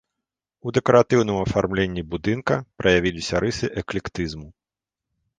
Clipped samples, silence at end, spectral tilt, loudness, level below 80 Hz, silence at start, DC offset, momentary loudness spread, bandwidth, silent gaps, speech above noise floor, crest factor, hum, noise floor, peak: under 0.1%; 0.9 s; -5.5 dB/octave; -22 LUFS; -44 dBFS; 0.65 s; under 0.1%; 12 LU; 9.6 kHz; none; 67 dB; 20 dB; none; -88 dBFS; -2 dBFS